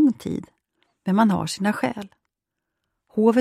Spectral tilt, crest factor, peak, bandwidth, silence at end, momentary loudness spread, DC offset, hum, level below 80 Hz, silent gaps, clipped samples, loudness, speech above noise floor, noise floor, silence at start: -6 dB/octave; 18 dB; -6 dBFS; 14 kHz; 0 s; 14 LU; under 0.1%; none; -60 dBFS; none; under 0.1%; -23 LUFS; 60 dB; -83 dBFS; 0 s